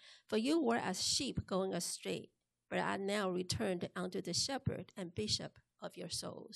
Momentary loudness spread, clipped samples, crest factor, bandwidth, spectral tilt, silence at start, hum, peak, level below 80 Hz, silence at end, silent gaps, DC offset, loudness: 11 LU; under 0.1%; 18 dB; 13 kHz; -3.5 dB/octave; 0 s; none; -22 dBFS; -64 dBFS; 0 s; none; under 0.1%; -38 LUFS